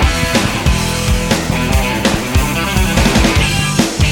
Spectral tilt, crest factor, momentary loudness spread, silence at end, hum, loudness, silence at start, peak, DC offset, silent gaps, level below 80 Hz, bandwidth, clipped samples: -4.5 dB/octave; 12 dB; 4 LU; 0 s; none; -14 LUFS; 0 s; 0 dBFS; under 0.1%; none; -18 dBFS; 17.5 kHz; under 0.1%